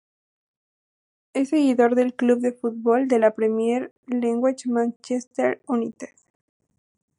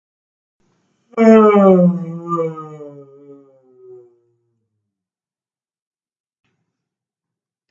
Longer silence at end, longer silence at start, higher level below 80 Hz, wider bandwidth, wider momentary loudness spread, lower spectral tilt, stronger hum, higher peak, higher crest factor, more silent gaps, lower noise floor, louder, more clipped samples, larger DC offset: second, 1.15 s vs 4.8 s; first, 1.35 s vs 1.15 s; second, -80 dBFS vs -64 dBFS; first, 11.5 kHz vs 7.6 kHz; second, 10 LU vs 24 LU; second, -5.5 dB/octave vs -9 dB/octave; neither; second, -4 dBFS vs 0 dBFS; about the same, 18 dB vs 18 dB; first, 3.91-4.03 s, 4.96-5.00 s, 5.27-5.31 s vs none; about the same, under -90 dBFS vs under -90 dBFS; second, -22 LUFS vs -12 LUFS; neither; neither